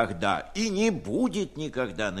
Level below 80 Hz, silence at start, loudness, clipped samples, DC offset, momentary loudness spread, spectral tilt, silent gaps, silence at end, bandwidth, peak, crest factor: -52 dBFS; 0 s; -28 LUFS; under 0.1%; under 0.1%; 6 LU; -4.5 dB/octave; none; 0 s; 12.5 kHz; -8 dBFS; 20 dB